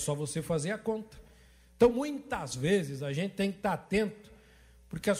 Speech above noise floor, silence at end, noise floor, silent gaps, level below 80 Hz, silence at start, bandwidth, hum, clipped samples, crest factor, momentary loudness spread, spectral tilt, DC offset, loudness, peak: 28 dB; 0 s; -59 dBFS; none; -56 dBFS; 0 s; 16 kHz; none; under 0.1%; 20 dB; 10 LU; -5.5 dB/octave; under 0.1%; -32 LUFS; -12 dBFS